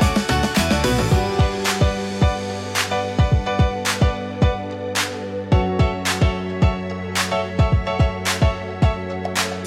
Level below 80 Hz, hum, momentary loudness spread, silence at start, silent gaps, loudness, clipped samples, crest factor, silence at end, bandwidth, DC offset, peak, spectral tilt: -28 dBFS; none; 5 LU; 0 s; none; -20 LUFS; under 0.1%; 14 dB; 0 s; 16 kHz; under 0.1%; -6 dBFS; -5 dB/octave